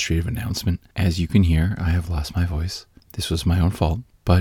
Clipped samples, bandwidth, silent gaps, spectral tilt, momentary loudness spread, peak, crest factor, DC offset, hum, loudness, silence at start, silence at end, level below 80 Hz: under 0.1%; 16 kHz; none; -6 dB/octave; 9 LU; -4 dBFS; 18 dB; under 0.1%; none; -22 LUFS; 0 s; 0 s; -30 dBFS